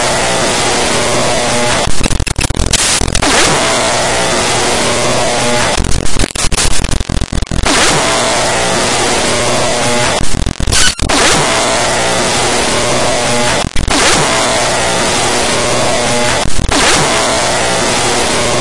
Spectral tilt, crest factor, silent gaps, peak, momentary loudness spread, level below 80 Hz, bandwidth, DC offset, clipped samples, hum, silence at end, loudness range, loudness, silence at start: -2.5 dB/octave; 12 dB; none; 0 dBFS; 6 LU; -22 dBFS; 12 kHz; 8%; under 0.1%; none; 0 s; 2 LU; -11 LUFS; 0 s